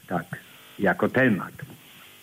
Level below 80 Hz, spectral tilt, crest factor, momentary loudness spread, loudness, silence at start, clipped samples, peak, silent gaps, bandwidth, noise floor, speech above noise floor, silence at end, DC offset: -64 dBFS; -7 dB/octave; 18 dB; 23 LU; -24 LUFS; 0.1 s; under 0.1%; -10 dBFS; none; 16 kHz; -49 dBFS; 24 dB; 0.45 s; under 0.1%